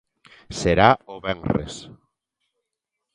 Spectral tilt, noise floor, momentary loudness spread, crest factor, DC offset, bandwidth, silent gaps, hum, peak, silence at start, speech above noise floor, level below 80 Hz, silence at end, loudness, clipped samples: -5.5 dB/octave; -83 dBFS; 19 LU; 24 dB; under 0.1%; 11 kHz; none; none; 0 dBFS; 0.5 s; 61 dB; -42 dBFS; 1.25 s; -21 LUFS; under 0.1%